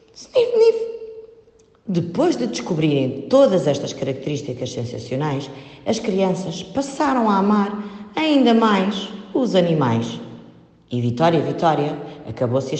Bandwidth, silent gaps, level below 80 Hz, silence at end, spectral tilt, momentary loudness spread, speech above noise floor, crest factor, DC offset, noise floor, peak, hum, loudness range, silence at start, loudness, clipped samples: 8.8 kHz; none; -58 dBFS; 0 s; -6.5 dB/octave; 13 LU; 33 dB; 16 dB; under 0.1%; -52 dBFS; -4 dBFS; none; 4 LU; 0.15 s; -20 LUFS; under 0.1%